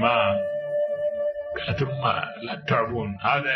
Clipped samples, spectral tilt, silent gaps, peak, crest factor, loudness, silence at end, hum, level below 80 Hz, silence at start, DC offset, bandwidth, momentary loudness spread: under 0.1%; -7 dB/octave; none; -6 dBFS; 18 dB; -26 LUFS; 0 s; none; -54 dBFS; 0 s; under 0.1%; 6.2 kHz; 6 LU